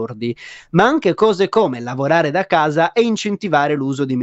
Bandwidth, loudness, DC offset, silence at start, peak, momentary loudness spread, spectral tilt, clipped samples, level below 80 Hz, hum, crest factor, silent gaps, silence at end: 8.2 kHz; -17 LUFS; under 0.1%; 0 s; 0 dBFS; 8 LU; -6 dB/octave; under 0.1%; -56 dBFS; none; 16 dB; none; 0 s